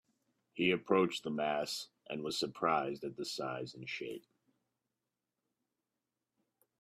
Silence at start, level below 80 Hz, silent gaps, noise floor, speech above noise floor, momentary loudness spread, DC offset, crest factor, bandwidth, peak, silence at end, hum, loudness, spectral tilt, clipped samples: 0.55 s; -80 dBFS; none; -90 dBFS; 53 dB; 12 LU; under 0.1%; 22 dB; 15.5 kHz; -16 dBFS; 2.6 s; none; -36 LUFS; -4.5 dB/octave; under 0.1%